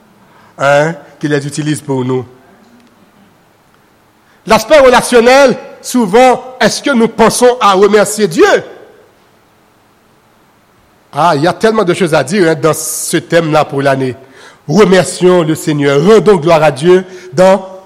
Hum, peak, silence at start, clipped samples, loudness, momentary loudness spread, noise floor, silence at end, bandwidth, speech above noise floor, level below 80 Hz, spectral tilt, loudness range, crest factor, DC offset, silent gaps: none; 0 dBFS; 0.6 s; 0.2%; -9 LUFS; 9 LU; -48 dBFS; 0.05 s; 16 kHz; 39 dB; -44 dBFS; -5 dB/octave; 8 LU; 10 dB; under 0.1%; none